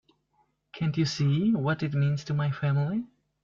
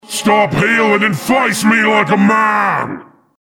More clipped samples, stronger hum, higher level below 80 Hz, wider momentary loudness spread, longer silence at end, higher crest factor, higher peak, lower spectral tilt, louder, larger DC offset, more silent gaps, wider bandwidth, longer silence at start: neither; neither; second, -60 dBFS vs -48 dBFS; about the same, 6 LU vs 5 LU; about the same, 0.4 s vs 0.4 s; about the same, 14 dB vs 14 dB; second, -14 dBFS vs 0 dBFS; first, -7 dB/octave vs -4.5 dB/octave; second, -28 LUFS vs -12 LUFS; neither; neither; second, 7.4 kHz vs 18 kHz; first, 0.75 s vs 0.1 s